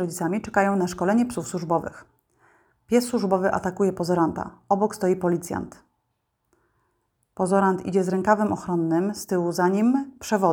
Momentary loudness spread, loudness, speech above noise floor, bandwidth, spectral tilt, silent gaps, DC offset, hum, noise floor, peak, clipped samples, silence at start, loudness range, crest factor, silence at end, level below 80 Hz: 6 LU; -24 LUFS; 52 dB; 19 kHz; -6.5 dB/octave; none; under 0.1%; none; -75 dBFS; -4 dBFS; under 0.1%; 0 s; 4 LU; 20 dB; 0 s; -58 dBFS